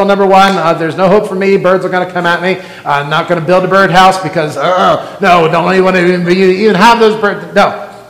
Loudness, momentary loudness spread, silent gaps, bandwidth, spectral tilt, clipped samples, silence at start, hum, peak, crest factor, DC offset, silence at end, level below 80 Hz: -9 LUFS; 7 LU; none; 16.5 kHz; -5.5 dB/octave; 3%; 0 s; none; 0 dBFS; 8 dB; 0.4%; 0.05 s; -44 dBFS